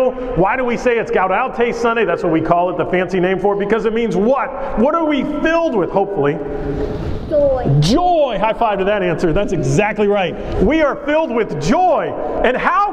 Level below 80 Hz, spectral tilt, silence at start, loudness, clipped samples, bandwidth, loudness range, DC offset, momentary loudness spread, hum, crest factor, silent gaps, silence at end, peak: -32 dBFS; -6.5 dB/octave; 0 s; -16 LUFS; under 0.1%; 11.5 kHz; 1 LU; under 0.1%; 4 LU; none; 16 dB; none; 0 s; 0 dBFS